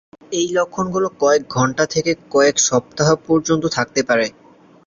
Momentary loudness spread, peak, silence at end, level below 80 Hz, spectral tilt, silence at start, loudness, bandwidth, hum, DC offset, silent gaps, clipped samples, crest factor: 5 LU; -2 dBFS; 0.55 s; -52 dBFS; -4 dB/octave; 0.3 s; -18 LUFS; 7.6 kHz; none; under 0.1%; none; under 0.1%; 16 dB